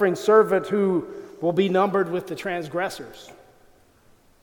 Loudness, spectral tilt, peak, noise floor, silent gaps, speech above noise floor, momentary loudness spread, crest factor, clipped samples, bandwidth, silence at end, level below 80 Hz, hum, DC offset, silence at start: -22 LUFS; -6 dB/octave; -4 dBFS; -56 dBFS; none; 34 dB; 12 LU; 20 dB; under 0.1%; 18.5 kHz; 1.1 s; -64 dBFS; none; under 0.1%; 0 s